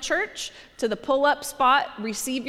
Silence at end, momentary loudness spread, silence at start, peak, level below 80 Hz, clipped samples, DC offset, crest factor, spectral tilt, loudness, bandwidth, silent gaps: 0 s; 10 LU; 0 s; -8 dBFS; -56 dBFS; under 0.1%; under 0.1%; 16 dB; -2 dB/octave; -24 LUFS; 16.5 kHz; none